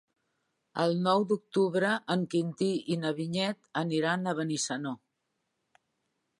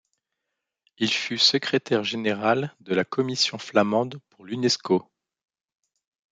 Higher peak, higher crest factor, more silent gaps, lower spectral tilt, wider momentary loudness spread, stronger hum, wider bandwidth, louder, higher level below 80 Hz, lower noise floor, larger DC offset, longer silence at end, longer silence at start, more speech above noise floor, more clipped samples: second, -12 dBFS vs -6 dBFS; about the same, 18 dB vs 20 dB; neither; about the same, -5 dB/octave vs -4 dB/octave; about the same, 6 LU vs 8 LU; neither; first, 11.5 kHz vs 9.4 kHz; second, -30 LUFS vs -24 LUFS; second, -80 dBFS vs -72 dBFS; about the same, -81 dBFS vs -83 dBFS; neither; first, 1.45 s vs 1.3 s; second, 0.75 s vs 1 s; second, 52 dB vs 59 dB; neither